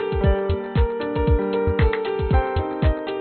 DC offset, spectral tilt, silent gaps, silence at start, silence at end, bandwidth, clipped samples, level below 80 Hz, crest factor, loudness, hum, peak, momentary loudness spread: under 0.1%; -6.5 dB/octave; none; 0 s; 0 s; 4.5 kHz; under 0.1%; -24 dBFS; 14 dB; -22 LUFS; none; -6 dBFS; 3 LU